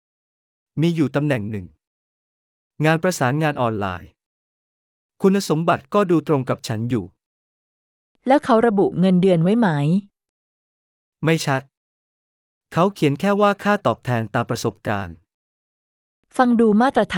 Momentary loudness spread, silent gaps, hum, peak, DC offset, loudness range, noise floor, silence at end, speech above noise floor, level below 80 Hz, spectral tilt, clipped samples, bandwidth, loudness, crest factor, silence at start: 10 LU; 1.87-2.71 s, 4.26-5.09 s, 7.26-8.15 s, 10.29-11.12 s, 11.77-12.61 s, 15.34-16.23 s; none; -4 dBFS; under 0.1%; 5 LU; under -90 dBFS; 0 s; over 72 dB; -60 dBFS; -6.5 dB/octave; under 0.1%; 18 kHz; -19 LUFS; 18 dB; 0.75 s